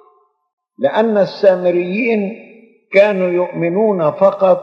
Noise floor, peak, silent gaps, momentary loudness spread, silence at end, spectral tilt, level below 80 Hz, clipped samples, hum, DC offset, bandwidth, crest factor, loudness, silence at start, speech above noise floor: -54 dBFS; 0 dBFS; none; 6 LU; 0 s; -8 dB/octave; -84 dBFS; under 0.1%; none; under 0.1%; 6.2 kHz; 14 dB; -15 LUFS; 0.8 s; 41 dB